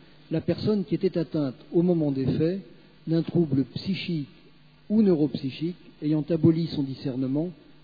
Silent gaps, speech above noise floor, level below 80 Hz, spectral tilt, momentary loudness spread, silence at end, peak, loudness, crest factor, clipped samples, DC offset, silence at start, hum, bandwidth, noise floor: none; 30 dB; -60 dBFS; -10 dB/octave; 11 LU; 0.3 s; -8 dBFS; -26 LUFS; 18 dB; under 0.1%; 0.1%; 0.3 s; none; 5 kHz; -56 dBFS